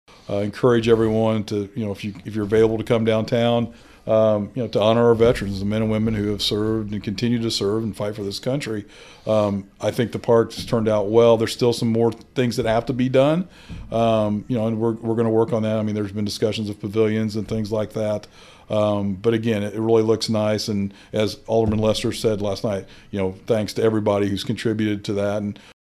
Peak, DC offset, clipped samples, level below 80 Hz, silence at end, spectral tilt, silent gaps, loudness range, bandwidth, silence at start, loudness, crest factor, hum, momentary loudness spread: -2 dBFS; under 0.1%; under 0.1%; -46 dBFS; 0.3 s; -6.5 dB/octave; none; 4 LU; 14.5 kHz; 0.3 s; -21 LUFS; 18 dB; none; 9 LU